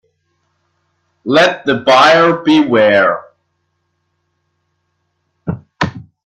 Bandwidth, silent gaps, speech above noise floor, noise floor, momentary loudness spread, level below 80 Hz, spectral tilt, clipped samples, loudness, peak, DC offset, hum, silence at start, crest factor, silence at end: 11 kHz; none; 57 dB; -67 dBFS; 17 LU; -54 dBFS; -5 dB/octave; under 0.1%; -11 LUFS; 0 dBFS; under 0.1%; none; 1.25 s; 14 dB; 0.25 s